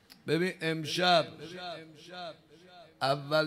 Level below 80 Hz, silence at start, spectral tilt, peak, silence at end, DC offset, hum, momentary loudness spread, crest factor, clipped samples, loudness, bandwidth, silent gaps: -76 dBFS; 0.1 s; -4.5 dB/octave; -12 dBFS; 0 s; under 0.1%; none; 19 LU; 20 dB; under 0.1%; -30 LUFS; 15.5 kHz; none